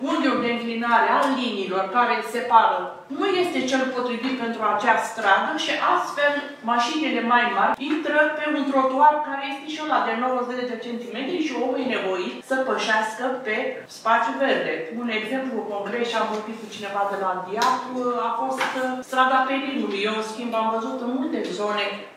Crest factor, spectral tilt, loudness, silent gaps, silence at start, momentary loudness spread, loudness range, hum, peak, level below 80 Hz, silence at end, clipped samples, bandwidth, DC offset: 22 dB; -3.5 dB/octave; -23 LUFS; none; 0 s; 9 LU; 4 LU; none; -2 dBFS; -76 dBFS; 0 s; under 0.1%; 15.5 kHz; under 0.1%